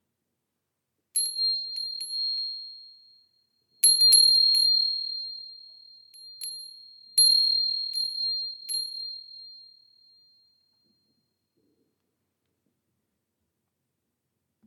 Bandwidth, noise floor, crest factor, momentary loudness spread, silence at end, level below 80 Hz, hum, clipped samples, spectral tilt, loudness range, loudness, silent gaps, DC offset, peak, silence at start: 18 kHz; -82 dBFS; 22 dB; 24 LU; 5.05 s; under -90 dBFS; none; under 0.1%; 6.5 dB/octave; 12 LU; -21 LUFS; none; under 0.1%; -8 dBFS; 1.15 s